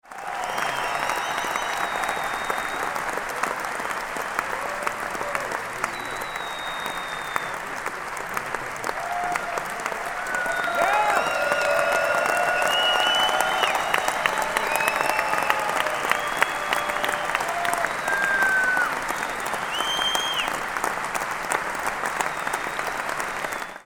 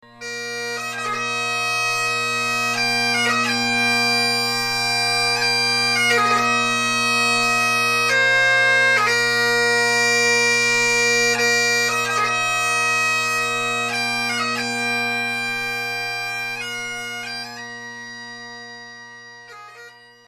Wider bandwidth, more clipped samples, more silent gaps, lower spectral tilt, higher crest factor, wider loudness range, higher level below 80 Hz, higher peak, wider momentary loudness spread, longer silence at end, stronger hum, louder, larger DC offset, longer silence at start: first, 19 kHz vs 14 kHz; neither; neither; about the same, -1 dB/octave vs -1.5 dB/octave; first, 24 dB vs 14 dB; second, 7 LU vs 11 LU; first, -52 dBFS vs -60 dBFS; first, -2 dBFS vs -6 dBFS; second, 9 LU vs 13 LU; second, 0.05 s vs 0.35 s; second, none vs 60 Hz at -50 dBFS; second, -24 LUFS vs -18 LUFS; neither; about the same, 0.05 s vs 0.15 s